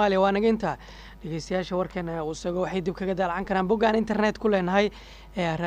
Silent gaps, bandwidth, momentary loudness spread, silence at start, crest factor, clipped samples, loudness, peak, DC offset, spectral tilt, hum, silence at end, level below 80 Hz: none; 9.8 kHz; 13 LU; 0 s; 16 dB; under 0.1%; -26 LUFS; -8 dBFS; under 0.1%; -6 dB/octave; none; 0 s; -48 dBFS